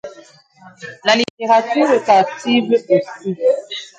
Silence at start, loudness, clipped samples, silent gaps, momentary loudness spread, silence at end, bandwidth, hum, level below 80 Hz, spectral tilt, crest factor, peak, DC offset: 0.05 s; -16 LUFS; under 0.1%; 1.30-1.37 s; 12 LU; 0.1 s; 9.2 kHz; none; -66 dBFS; -4.5 dB/octave; 16 dB; 0 dBFS; under 0.1%